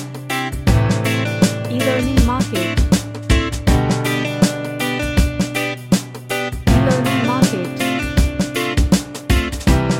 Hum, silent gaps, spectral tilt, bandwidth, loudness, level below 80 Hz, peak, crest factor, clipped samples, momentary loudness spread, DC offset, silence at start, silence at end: none; none; -5.5 dB/octave; 17 kHz; -18 LUFS; -24 dBFS; -2 dBFS; 16 dB; under 0.1%; 5 LU; under 0.1%; 0 s; 0 s